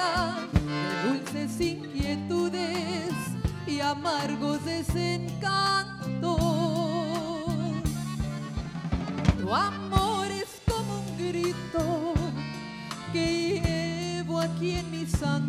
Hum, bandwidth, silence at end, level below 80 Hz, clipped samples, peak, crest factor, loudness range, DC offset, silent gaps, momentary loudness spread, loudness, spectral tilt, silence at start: none; 16 kHz; 0 s; -42 dBFS; under 0.1%; -8 dBFS; 22 dB; 2 LU; under 0.1%; none; 6 LU; -29 LUFS; -5.5 dB/octave; 0 s